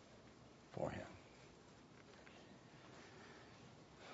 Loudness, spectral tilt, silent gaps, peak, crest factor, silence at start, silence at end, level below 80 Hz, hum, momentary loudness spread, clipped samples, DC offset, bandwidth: -56 LUFS; -5 dB/octave; none; -30 dBFS; 26 dB; 0 s; 0 s; -74 dBFS; none; 16 LU; under 0.1%; under 0.1%; 7.6 kHz